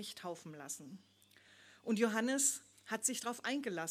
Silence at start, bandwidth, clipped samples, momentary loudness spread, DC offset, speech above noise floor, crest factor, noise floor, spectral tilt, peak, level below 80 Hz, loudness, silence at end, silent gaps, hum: 0 s; 16.5 kHz; under 0.1%; 16 LU; under 0.1%; 27 dB; 20 dB; -65 dBFS; -2.5 dB/octave; -18 dBFS; -88 dBFS; -37 LUFS; 0 s; none; none